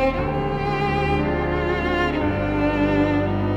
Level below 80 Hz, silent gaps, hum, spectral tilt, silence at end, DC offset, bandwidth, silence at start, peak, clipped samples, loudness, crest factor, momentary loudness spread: -32 dBFS; none; none; -8 dB/octave; 0 s; under 0.1%; 8.4 kHz; 0 s; -8 dBFS; under 0.1%; -22 LUFS; 12 dB; 4 LU